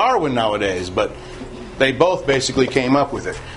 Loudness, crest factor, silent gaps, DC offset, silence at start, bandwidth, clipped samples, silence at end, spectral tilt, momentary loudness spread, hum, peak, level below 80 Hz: -18 LUFS; 18 dB; none; under 0.1%; 0 s; 11 kHz; under 0.1%; 0 s; -4.5 dB/octave; 17 LU; none; 0 dBFS; -42 dBFS